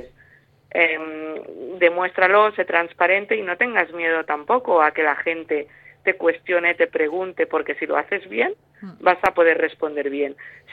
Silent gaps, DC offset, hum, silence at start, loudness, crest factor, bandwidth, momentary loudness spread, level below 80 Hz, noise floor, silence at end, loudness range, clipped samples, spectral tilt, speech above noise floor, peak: none; under 0.1%; none; 0 s; -20 LUFS; 20 dB; 4.8 kHz; 10 LU; -66 dBFS; -54 dBFS; 0 s; 3 LU; under 0.1%; -5.5 dB/octave; 34 dB; 0 dBFS